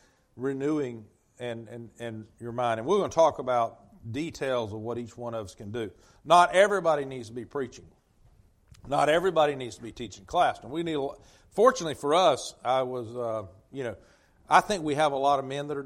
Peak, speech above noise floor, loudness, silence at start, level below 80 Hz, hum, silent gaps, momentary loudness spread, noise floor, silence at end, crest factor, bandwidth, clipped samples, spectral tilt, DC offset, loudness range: -6 dBFS; 33 dB; -27 LUFS; 0.35 s; -60 dBFS; none; none; 17 LU; -60 dBFS; 0 s; 22 dB; 15 kHz; under 0.1%; -4.5 dB/octave; under 0.1%; 3 LU